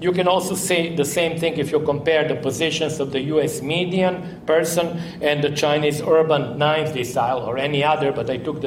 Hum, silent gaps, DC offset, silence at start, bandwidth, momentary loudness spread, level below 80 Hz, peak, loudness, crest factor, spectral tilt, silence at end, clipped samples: none; none; under 0.1%; 0 s; 16.5 kHz; 4 LU; -54 dBFS; -6 dBFS; -20 LUFS; 14 dB; -4.5 dB/octave; 0 s; under 0.1%